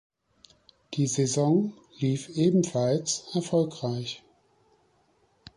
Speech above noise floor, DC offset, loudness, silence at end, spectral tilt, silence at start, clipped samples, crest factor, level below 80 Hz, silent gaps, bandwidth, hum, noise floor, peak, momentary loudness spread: 41 dB; under 0.1%; -27 LUFS; 1.4 s; -5.5 dB/octave; 0.9 s; under 0.1%; 16 dB; -68 dBFS; none; 11 kHz; none; -67 dBFS; -12 dBFS; 11 LU